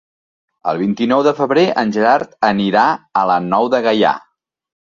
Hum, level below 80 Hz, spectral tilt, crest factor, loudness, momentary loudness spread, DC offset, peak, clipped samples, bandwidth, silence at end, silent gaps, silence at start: none; -58 dBFS; -6 dB/octave; 14 dB; -15 LUFS; 5 LU; under 0.1%; -2 dBFS; under 0.1%; 7.4 kHz; 0.65 s; none; 0.65 s